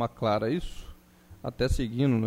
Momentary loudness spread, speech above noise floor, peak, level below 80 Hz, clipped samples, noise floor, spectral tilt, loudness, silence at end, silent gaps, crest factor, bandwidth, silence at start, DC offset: 16 LU; 26 dB; -12 dBFS; -38 dBFS; under 0.1%; -53 dBFS; -7 dB/octave; -29 LUFS; 0 s; none; 16 dB; 16 kHz; 0 s; under 0.1%